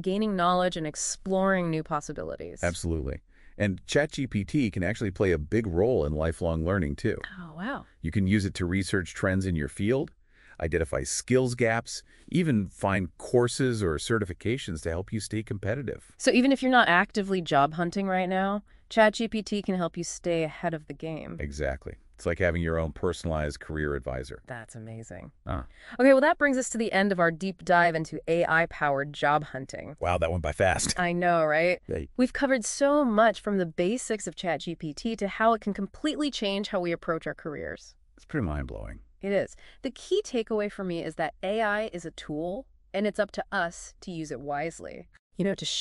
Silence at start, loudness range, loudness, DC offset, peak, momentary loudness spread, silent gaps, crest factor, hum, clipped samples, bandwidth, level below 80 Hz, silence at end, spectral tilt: 0 s; 7 LU; -28 LUFS; under 0.1%; -6 dBFS; 14 LU; 45.19-45.30 s; 20 dB; none; under 0.1%; 11.5 kHz; -46 dBFS; 0 s; -5 dB/octave